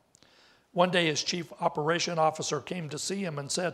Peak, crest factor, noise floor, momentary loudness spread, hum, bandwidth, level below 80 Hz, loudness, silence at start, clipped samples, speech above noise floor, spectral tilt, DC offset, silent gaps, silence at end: -10 dBFS; 20 dB; -61 dBFS; 9 LU; none; 15 kHz; -72 dBFS; -29 LUFS; 0.75 s; under 0.1%; 32 dB; -3.5 dB/octave; under 0.1%; none; 0 s